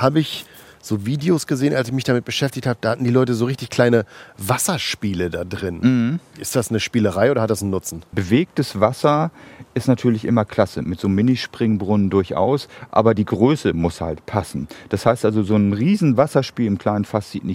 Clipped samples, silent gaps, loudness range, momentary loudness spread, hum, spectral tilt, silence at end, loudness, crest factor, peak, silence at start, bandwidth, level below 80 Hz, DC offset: under 0.1%; none; 2 LU; 9 LU; none; -6 dB/octave; 0 s; -20 LUFS; 18 dB; 0 dBFS; 0 s; 16.5 kHz; -52 dBFS; under 0.1%